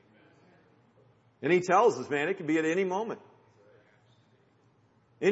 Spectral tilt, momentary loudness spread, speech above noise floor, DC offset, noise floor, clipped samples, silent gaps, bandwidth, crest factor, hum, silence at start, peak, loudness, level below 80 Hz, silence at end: -5.5 dB/octave; 12 LU; 38 dB; under 0.1%; -65 dBFS; under 0.1%; none; 8 kHz; 20 dB; none; 1.4 s; -10 dBFS; -28 LUFS; -82 dBFS; 0 s